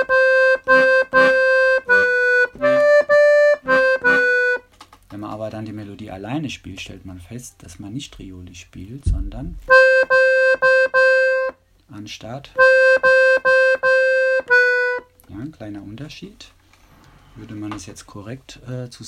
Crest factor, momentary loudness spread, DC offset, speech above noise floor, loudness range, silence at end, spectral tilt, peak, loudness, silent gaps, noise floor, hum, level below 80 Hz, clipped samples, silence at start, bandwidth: 18 dB; 22 LU; under 0.1%; 30 dB; 17 LU; 0 s; -4.5 dB/octave; 0 dBFS; -15 LUFS; none; -51 dBFS; none; -40 dBFS; under 0.1%; 0 s; 10.5 kHz